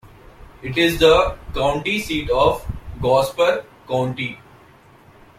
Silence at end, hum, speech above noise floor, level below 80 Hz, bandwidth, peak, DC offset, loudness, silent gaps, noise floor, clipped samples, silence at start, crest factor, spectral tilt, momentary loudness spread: 1 s; none; 30 dB; -36 dBFS; 16 kHz; 0 dBFS; under 0.1%; -19 LUFS; none; -48 dBFS; under 0.1%; 0.05 s; 20 dB; -5 dB/octave; 13 LU